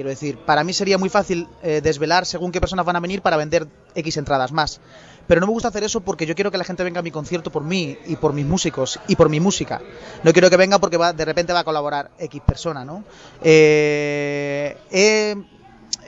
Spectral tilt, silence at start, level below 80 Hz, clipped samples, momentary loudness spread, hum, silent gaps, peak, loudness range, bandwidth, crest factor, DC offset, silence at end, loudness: -4.5 dB/octave; 0 s; -40 dBFS; under 0.1%; 13 LU; none; none; -2 dBFS; 5 LU; 8 kHz; 18 dB; under 0.1%; 0 s; -19 LUFS